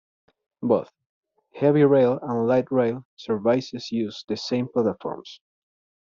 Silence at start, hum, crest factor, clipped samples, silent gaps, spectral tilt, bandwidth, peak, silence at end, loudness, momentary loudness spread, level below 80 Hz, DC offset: 0.6 s; none; 18 dB; under 0.1%; 1.06-1.23 s, 3.05-3.17 s; -6 dB/octave; 7.4 kHz; -6 dBFS; 0.75 s; -23 LUFS; 15 LU; -66 dBFS; under 0.1%